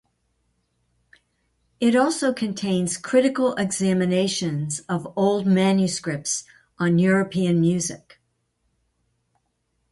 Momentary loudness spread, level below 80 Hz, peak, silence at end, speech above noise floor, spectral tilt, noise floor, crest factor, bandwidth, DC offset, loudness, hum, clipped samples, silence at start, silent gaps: 8 LU; -60 dBFS; -6 dBFS; 1.95 s; 51 dB; -5 dB/octave; -72 dBFS; 18 dB; 11.5 kHz; under 0.1%; -22 LUFS; none; under 0.1%; 1.8 s; none